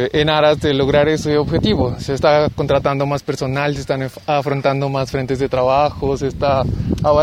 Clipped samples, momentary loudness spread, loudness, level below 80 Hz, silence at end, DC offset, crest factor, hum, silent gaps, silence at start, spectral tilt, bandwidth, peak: under 0.1%; 6 LU; -17 LUFS; -34 dBFS; 0 s; under 0.1%; 16 dB; none; none; 0 s; -6.5 dB/octave; 14.5 kHz; -2 dBFS